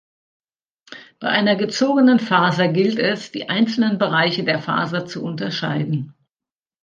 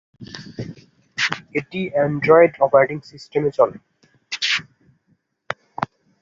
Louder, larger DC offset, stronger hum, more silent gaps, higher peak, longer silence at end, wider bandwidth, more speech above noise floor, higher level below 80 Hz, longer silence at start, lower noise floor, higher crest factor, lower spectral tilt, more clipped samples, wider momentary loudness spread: about the same, -19 LUFS vs -19 LUFS; neither; neither; neither; about the same, -2 dBFS vs -2 dBFS; first, 0.7 s vs 0.35 s; about the same, 7.4 kHz vs 7.8 kHz; first, over 71 dB vs 48 dB; second, -68 dBFS vs -60 dBFS; first, 0.9 s vs 0.2 s; first, under -90 dBFS vs -65 dBFS; about the same, 18 dB vs 20 dB; first, -6 dB/octave vs -4.5 dB/octave; neither; second, 11 LU vs 20 LU